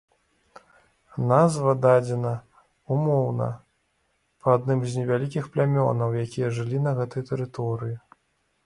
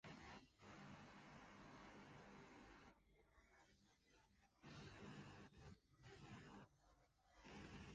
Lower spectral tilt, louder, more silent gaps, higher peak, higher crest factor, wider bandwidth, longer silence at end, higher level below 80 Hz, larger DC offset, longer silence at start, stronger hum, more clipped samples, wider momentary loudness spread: first, -8 dB/octave vs -5 dB/octave; first, -24 LUFS vs -63 LUFS; neither; first, -4 dBFS vs -46 dBFS; about the same, 20 dB vs 18 dB; first, 11.5 kHz vs 9 kHz; first, 0.7 s vs 0 s; first, -62 dBFS vs -76 dBFS; neither; first, 1.15 s vs 0.05 s; neither; neither; first, 11 LU vs 7 LU